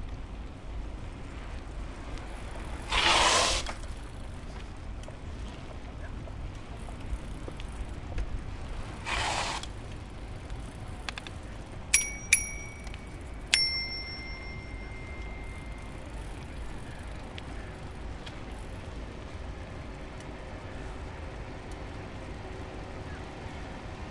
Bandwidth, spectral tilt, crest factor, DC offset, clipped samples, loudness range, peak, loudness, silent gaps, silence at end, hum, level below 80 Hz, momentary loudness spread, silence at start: 11.5 kHz; -2 dB/octave; 34 dB; under 0.1%; under 0.1%; 13 LU; -2 dBFS; -34 LUFS; none; 0 s; none; -42 dBFS; 18 LU; 0 s